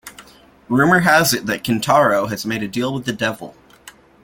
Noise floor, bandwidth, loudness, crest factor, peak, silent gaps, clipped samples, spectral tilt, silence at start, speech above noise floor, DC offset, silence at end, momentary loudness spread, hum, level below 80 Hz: -46 dBFS; 17 kHz; -17 LUFS; 18 dB; 0 dBFS; none; under 0.1%; -4.5 dB/octave; 0.05 s; 29 dB; under 0.1%; 0.35 s; 10 LU; none; -52 dBFS